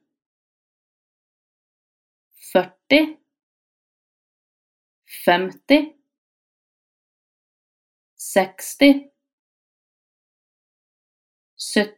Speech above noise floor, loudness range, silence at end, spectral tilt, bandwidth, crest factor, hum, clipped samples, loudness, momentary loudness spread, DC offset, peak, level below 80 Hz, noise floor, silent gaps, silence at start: over 72 dB; 2 LU; 0.05 s; -4 dB/octave; 17 kHz; 24 dB; none; under 0.1%; -19 LUFS; 15 LU; under 0.1%; -2 dBFS; -64 dBFS; under -90 dBFS; 3.43-5.02 s, 6.18-8.17 s, 9.33-11.57 s; 2.45 s